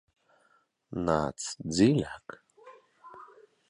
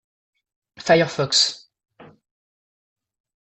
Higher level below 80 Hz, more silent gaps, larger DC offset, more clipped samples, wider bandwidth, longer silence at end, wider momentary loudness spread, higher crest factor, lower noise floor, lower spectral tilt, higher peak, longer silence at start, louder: first, -56 dBFS vs -62 dBFS; neither; neither; neither; first, 11 kHz vs 8.4 kHz; second, 0.45 s vs 1.4 s; first, 26 LU vs 14 LU; about the same, 22 dB vs 22 dB; second, -69 dBFS vs under -90 dBFS; first, -5.5 dB/octave vs -3 dB/octave; second, -10 dBFS vs -4 dBFS; about the same, 0.9 s vs 0.8 s; second, -29 LUFS vs -18 LUFS